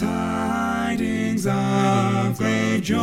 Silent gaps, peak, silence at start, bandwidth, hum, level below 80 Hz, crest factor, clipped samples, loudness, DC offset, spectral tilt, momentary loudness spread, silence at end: none; -6 dBFS; 0 s; 16 kHz; none; -48 dBFS; 14 dB; under 0.1%; -22 LUFS; under 0.1%; -6 dB/octave; 4 LU; 0 s